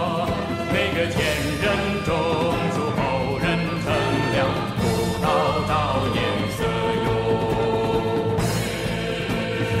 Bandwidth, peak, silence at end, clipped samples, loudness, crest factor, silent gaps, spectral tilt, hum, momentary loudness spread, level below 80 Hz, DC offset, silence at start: 16 kHz; -8 dBFS; 0 s; under 0.1%; -22 LUFS; 14 dB; none; -5.5 dB/octave; none; 3 LU; -38 dBFS; under 0.1%; 0 s